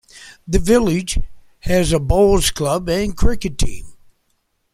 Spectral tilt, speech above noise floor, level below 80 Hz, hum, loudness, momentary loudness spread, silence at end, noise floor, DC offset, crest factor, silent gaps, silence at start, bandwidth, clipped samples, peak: -5 dB/octave; 51 dB; -26 dBFS; none; -18 LUFS; 15 LU; 0.8 s; -67 dBFS; under 0.1%; 16 dB; none; 0.15 s; 15.5 kHz; under 0.1%; -2 dBFS